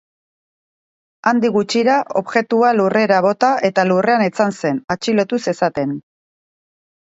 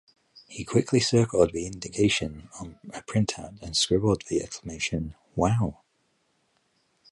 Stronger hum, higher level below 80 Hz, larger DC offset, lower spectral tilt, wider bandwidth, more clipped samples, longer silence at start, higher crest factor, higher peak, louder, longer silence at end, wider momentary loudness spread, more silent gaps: neither; second, -62 dBFS vs -48 dBFS; neither; about the same, -5.5 dB/octave vs -5 dB/octave; second, 8 kHz vs 11.5 kHz; neither; first, 1.25 s vs 0.5 s; about the same, 18 dB vs 22 dB; first, 0 dBFS vs -6 dBFS; first, -16 LUFS vs -26 LUFS; second, 1.1 s vs 1.4 s; second, 7 LU vs 17 LU; first, 4.84-4.88 s vs none